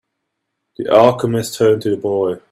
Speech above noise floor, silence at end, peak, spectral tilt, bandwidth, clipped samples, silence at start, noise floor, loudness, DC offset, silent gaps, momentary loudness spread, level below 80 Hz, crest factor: 60 dB; 0.15 s; 0 dBFS; -6 dB/octave; 15.5 kHz; under 0.1%; 0.8 s; -75 dBFS; -15 LUFS; under 0.1%; none; 8 LU; -56 dBFS; 16 dB